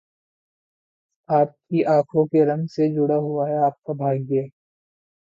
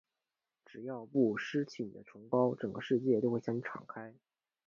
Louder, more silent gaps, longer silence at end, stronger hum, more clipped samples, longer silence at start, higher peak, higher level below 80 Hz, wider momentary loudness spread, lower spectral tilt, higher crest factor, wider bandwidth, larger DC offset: first, -21 LUFS vs -35 LUFS; neither; first, 0.9 s vs 0.55 s; neither; neither; first, 1.3 s vs 0.75 s; first, -6 dBFS vs -16 dBFS; first, -70 dBFS vs -78 dBFS; second, 6 LU vs 17 LU; first, -10 dB/octave vs -7.5 dB/octave; about the same, 16 dB vs 20 dB; about the same, 7.4 kHz vs 7.2 kHz; neither